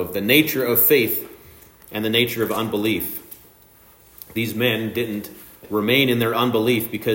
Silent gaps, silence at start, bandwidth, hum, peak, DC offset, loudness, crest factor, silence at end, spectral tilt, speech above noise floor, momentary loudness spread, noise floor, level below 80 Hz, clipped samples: none; 0 s; 16.5 kHz; none; -2 dBFS; under 0.1%; -19 LUFS; 18 dB; 0 s; -4.5 dB/octave; 31 dB; 14 LU; -51 dBFS; -58 dBFS; under 0.1%